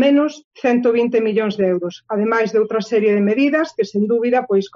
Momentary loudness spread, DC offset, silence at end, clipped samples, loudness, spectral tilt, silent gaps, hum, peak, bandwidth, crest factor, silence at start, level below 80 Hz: 6 LU; under 0.1%; 0.1 s; under 0.1%; -17 LUFS; -6.5 dB/octave; 0.44-0.51 s; none; -6 dBFS; 7.4 kHz; 12 dB; 0 s; -66 dBFS